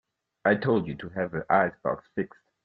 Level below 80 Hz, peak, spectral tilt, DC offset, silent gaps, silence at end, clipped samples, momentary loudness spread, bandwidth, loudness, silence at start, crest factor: -62 dBFS; -6 dBFS; -10 dB/octave; under 0.1%; none; 0.4 s; under 0.1%; 10 LU; 5 kHz; -27 LUFS; 0.45 s; 22 dB